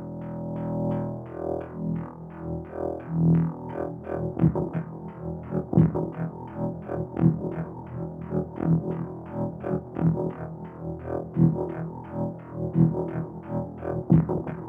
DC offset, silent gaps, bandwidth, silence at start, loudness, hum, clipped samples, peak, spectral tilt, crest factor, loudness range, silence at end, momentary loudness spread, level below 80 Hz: under 0.1%; none; 2.9 kHz; 0 s; -28 LUFS; none; under 0.1%; -8 dBFS; -12 dB/octave; 20 dB; 3 LU; 0 s; 13 LU; -48 dBFS